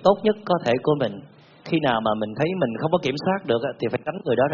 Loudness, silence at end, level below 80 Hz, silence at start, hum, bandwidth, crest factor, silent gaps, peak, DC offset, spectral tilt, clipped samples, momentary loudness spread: -23 LUFS; 0 s; -58 dBFS; 0 s; none; 7 kHz; 20 dB; none; -4 dBFS; under 0.1%; -5 dB/octave; under 0.1%; 6 LU